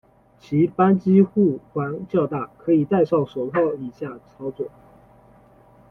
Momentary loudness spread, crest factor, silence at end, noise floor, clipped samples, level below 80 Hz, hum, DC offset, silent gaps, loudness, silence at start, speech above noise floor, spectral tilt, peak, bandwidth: 17 LU; 18 dB; 1.2 s; -52 dBFS; under 0.1%; -60 dBFS; none; under 0.1%; none; -21 LUFS; 0.5 s; 31 dB; -10.5 dB/octave; -4 dBFS; 4.6 kHz